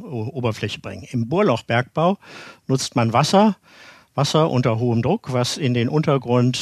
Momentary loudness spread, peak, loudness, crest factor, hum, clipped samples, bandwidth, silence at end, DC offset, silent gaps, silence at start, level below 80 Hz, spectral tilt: 12 LU; -2 dBFS; -20 LUFS; 18 dB; none; under 0.1%; 13.5 kHz; 0 s; under 0.1%; none; 0 s; -56 dBFS; -6 dB/octave